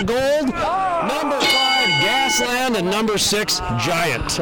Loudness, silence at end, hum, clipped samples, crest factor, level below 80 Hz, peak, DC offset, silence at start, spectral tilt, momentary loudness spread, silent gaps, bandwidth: -18 LUFS; 0 s; none; under 0.1%; 12 dB; -40 dBFS; -6 dBFS; under 0.1%; 0 s; -2.5 dB/octave; 5 LU; none; over 20 kHz